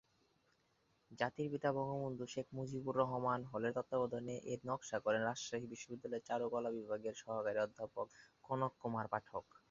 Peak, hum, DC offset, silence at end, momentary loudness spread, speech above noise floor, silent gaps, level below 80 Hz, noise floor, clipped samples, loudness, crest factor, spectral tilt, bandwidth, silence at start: -20 dBFS; none; under 0.1%; 0.3 s; 8 LU; 37 dB; none; -76 dBFS; -78 dBFS; under 0.1%; -42 LUFS; 22 dB; -5 dB/octave; 7.4 kHz; 1.1 s